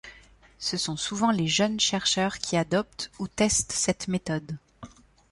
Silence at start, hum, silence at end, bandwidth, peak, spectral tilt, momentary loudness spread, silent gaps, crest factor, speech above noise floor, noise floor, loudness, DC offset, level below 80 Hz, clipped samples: 0.05 s; none; 0.45 s; 11.5 kHz; -10 dBFS; -3 dB/octave; 11 LU; none; 18 dB; 27 dB; -54 dBFS; -26 LUFS; under 0.1%; -54 dBFS; under 0.1%